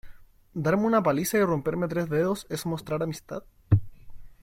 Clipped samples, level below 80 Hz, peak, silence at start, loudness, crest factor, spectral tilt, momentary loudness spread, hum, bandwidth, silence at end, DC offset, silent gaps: under 0.1%; -50 dBFS; -8 dBFS; 0.05 s; -27 LUFS; 20 dB; -6.5 dB/octave; 12 LU; none; 16.5 kHz; 0.1 s; under 0.1%; none